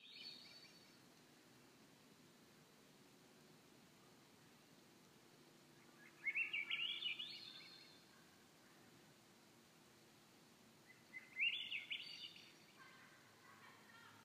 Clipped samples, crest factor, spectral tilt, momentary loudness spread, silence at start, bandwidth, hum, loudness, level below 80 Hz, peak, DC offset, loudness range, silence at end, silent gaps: under 0.1%; 24 dB; -1 dB/octave; 25 LU; 0 s; 15.5 kHz; none; -45 LUFS; under -90 dBFS; -30 dBFS; under 0.1%; 20 LU; 0 s; none